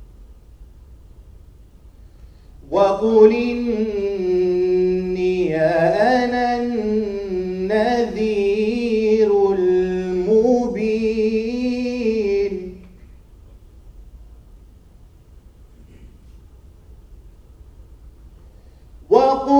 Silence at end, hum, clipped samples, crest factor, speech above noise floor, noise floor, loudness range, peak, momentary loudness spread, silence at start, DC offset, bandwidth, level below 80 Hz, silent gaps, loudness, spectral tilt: 0 s; none; under 0.1%; 20 dB; 30 dB; -46 dBFS; 8 LU; 0 dBFS; 7 LU; 0 s; under 0.1%; 8.8 kHz; -44 dBFS; none; -18 LUFS; -7 dB/octave